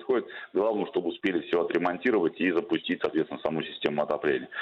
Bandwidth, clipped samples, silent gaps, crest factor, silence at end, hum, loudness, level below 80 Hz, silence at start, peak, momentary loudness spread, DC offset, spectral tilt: 6.4 kHz; under 0.1%; none; 18 dB; 0 s; none; -28 LUFS; -68 dBFS; 0 s; -10 dBFS; 5 LU; under 0.1%; -7 dB/octave